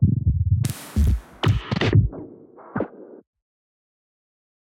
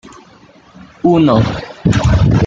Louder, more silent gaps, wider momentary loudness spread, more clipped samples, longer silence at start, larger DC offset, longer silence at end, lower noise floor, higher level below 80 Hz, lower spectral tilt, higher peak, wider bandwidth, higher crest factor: second, -23 LUFS vs -13 LUFS; neither; first, 13 LU vs 8 LU; neither; about the same, 0 s vs 0.05 s; neither; first, 1.65 s vs 0 s; about the same, -44 dBFS vs -43 dBFS; second, -32 dBFS vs -26 dBFS; about the same, -7 dB/octave vs -7.5 dB/octave; second, -4 dBFS vs 0 dBFS; first, 16 kHz vs 7.8 kHz; first, 18 dB vs 12 dB